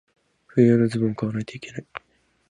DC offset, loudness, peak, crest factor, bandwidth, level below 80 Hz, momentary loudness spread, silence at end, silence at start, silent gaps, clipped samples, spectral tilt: under 0.1%; -22 LUFS; -6 dBFS; 18 dB; 10.5 kHz; -60 dBFS; 20 LU; 0.55 s; 0.55 s; none; under 0.1%; -8 dB/octave